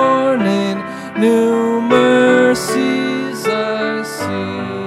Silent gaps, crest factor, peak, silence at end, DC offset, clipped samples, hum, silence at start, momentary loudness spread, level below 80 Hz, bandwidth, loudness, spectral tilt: none; 14 dB; 0 dBFS; 0 s; under 0.1%; under 0.1%; none; 0 s; 10 LU; -56 dBFS; 15 kHz; -15 LUFS; -5 dB/octave